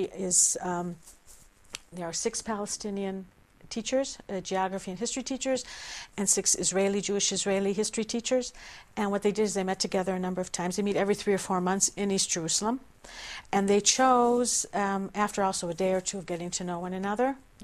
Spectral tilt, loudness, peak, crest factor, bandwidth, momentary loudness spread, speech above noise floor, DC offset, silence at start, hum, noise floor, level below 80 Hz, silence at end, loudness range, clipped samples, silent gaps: -3 dB/octave; -28 LUFS; -10 dBFS; 20 dB; 15 kHz; 15 LU; 26 dB; under 0.1%; 0 s; none; -54 dBFS; -58 dBFS; 0 s; 7 LU; under 0.1%; none